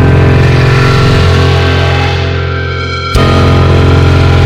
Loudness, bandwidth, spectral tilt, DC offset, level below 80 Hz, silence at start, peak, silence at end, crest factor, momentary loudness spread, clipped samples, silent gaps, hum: -8 LUFS; 11.5 kHz; -6.5 dB/octave; under 0.1%; -20 dBFS; 0 s; 0 dBFS; 0 s; 6 dB; 7 LU; 0.3%; none; none